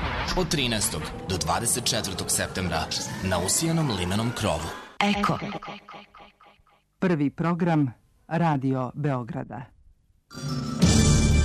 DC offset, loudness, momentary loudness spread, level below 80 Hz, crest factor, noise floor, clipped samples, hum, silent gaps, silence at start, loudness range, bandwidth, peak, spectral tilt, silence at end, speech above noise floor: under 0.1%; -25 LUFS; 13 LU; -36 dBFS; 18 dB; -61 dBFS; under 0.1%; none; none; 0 s; 3 LU; 13.5 kHz; -6 dBFS; -4.5 dB/octave; 0 s; 35 dB